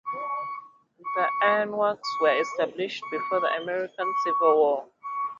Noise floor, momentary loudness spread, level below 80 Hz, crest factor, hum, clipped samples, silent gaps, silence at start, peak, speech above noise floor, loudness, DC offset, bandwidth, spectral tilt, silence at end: -46 dBFS; 10 LU; -76 dBFS; 18 dB; none; under 0.1%; none; 0.05 s; -8 dBFS; 21 dB; -26 LUFS; under 0.1%; 7.6 kHz; -4 dB/octave; 0 s